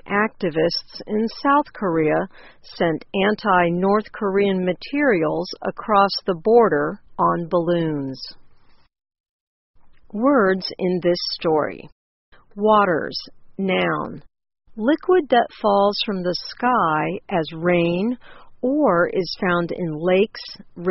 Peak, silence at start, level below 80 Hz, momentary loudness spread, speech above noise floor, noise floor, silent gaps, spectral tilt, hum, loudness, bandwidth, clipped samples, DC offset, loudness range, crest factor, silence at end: -2 dBFS; 0.05 s; -54 dBFS; 11 LU; 28 dB; -48 dBFS; 9.20-9.74 s, 11.92-12.32 s; -4 dB/octave; none; -20 LUFS; 6 kHz; under 0.1%; under 0.1%; 4 LU; 18 dB; 0 s